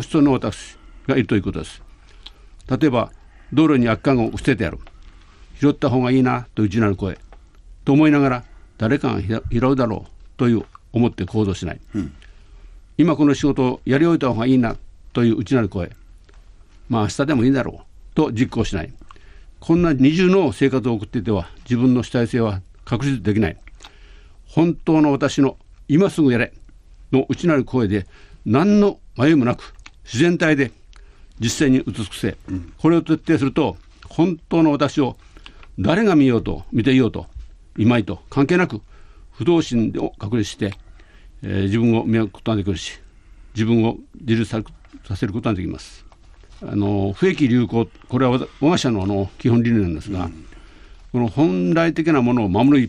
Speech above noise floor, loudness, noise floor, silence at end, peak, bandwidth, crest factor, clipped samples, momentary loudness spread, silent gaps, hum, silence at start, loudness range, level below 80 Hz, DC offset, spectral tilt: 27 dB; -19 LUFS; -45 dBFS; 0 s; -4 dBFS; 11.5 kHz; 16 dB; under 0.1%; 13 LU; none; none; 0 s; 4 LU; -40 dBFS; under 0.1%; -7 dB/octave